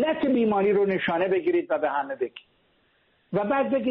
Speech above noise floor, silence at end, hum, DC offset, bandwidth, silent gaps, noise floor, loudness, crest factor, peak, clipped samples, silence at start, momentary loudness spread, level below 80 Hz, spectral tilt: 42 dB; 0 s; none; under 0.1%; 4.6 kHz; none; -66 dBFS; -25 LUFS; 12 dB; -14 dBFS; under 0.1%; 0 s; 9 LU; -64 dBFS; -4.5 dB/octave